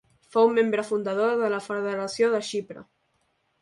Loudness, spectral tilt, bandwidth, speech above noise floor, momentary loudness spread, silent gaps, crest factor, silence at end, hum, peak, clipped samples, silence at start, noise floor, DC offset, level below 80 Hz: -25 LUFS; -4.5 dB/octave; 11.5 kHz; 47 dB; 11 LU; none; 18 dB; 0.8 s; none; -8 dBFS; under 0.1%; 0.35 s; -71 dBFS; under 0.1%; -74 dBFS